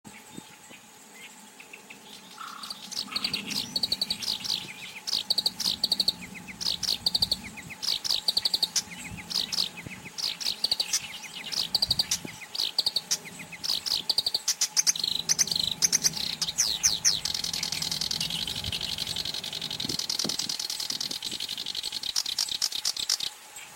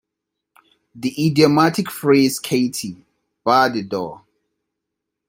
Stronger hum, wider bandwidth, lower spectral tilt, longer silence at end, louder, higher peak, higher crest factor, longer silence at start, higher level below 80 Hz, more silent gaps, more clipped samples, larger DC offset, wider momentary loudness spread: neither; about the same, 17 kHz vs 16.5 kHz; second, 0 dB/octave vs -5 dB/octave; second, 0 s vs 1.1 s; second, -27 LUFS vs -18 LUFS; second, -8 dBFS vs 0 dBFS; about the same, 22 dB vs 20 dB; second, 0.05 s vs 0.95 s; about the same, -58 dBFS vs -62 dBFS; neither; neither; neither; first, 17 LU vs 13 LU